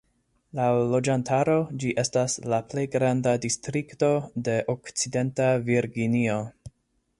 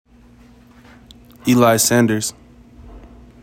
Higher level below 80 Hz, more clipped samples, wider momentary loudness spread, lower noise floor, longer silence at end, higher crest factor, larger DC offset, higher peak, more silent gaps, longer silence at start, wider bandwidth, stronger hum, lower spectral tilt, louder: second, -60 dBFS vs -48 dBFS; neither; second, 5 LU vs 12 LU; first, -70 dBFS vs -47 dBFS; first, 0.5 s vs 0.35 s; about the same, 16 dB vs 18 dB; neither; second, -10 dBFS vs -2 dBFS; neither; second, 0.55 s vs 1.45 s; second, 11.5 kHz vs 17 kHz; second, none vs 60 Hz at -35 dBFS; first, -5.5 dB/octave vs -4 dB/octave; second, -25 LUFS vs -16 LUFS